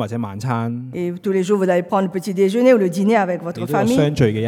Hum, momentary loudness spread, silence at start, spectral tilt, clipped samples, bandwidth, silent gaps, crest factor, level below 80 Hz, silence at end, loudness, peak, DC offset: none; 10 LU; 0 s; -7 dB/octave; under 0.1%; 17 kHz; none; 16 dB; -52 dBFS; 0 s; -18 LUFS; -2 dBFS; under 0.1%